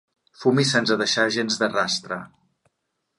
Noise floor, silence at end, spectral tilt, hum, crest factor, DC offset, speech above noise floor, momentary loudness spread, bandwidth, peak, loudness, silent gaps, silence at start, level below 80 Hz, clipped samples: -77 dBFS; 0.9 s; -3.5 dB/octave; none; 18 dB; under 0.1%; 55 dB; 7 LU; 11.5 kHz; -6 dBFS; -21 LUFS; none; 0.4 s; -68 dBFS; under 0.1%